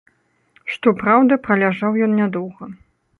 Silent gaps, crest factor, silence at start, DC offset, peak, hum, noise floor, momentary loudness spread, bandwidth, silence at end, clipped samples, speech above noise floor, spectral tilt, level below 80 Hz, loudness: none; 18 dB; 0.65 s; under 0.1%; -2 dBFS; none; -58 dBFS; 18 LU; 4.5 kHz; 0.45 s; under 0.1%; 41 dB; -8.5 dB/octave; -60 dBFS; -17 LUFS